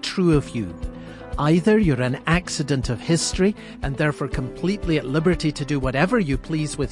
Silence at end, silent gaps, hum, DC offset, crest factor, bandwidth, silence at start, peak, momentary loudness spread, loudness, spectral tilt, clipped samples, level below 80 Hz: 0 s; none; none; under 0.1%; 18 dB; 11.5 kHz; 0 s; -4 dBFS; 11 LU; -22 LUFS; -5.5 dB/octave; under 0.1%; -36 dBFS